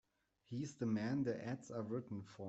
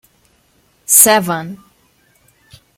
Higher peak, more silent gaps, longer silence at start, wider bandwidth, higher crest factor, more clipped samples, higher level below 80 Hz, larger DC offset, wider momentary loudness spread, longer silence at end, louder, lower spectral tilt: second, -28 dBFS vs 0 dBFS; neither; second, 0.5 s vs 0.9 s; second, 8.2 kHz vs 16.5 kHz; about the same, 16 dB vs 18 dB; second, under 0.1% vs 0.2%; second, -78 dBFS vs -60 dBFS; neither; second, 9 LU vs 24 LU; second, 0 s vs 1.2 s; second, -43 LUFS vs -10 LUFS; first, -7 dB/octave vs -2 dB/octave